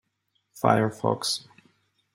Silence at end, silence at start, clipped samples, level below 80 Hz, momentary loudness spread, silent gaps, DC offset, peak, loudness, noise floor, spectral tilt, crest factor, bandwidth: 0.75 s; 0.55 s; under 0.1%; -66 dBFS; 6 LU; none; under 0.1%; -4 dBFS; -25 LUFS; -75 dBFS; -4.5 dB/octave; 24 dB; 16 kHz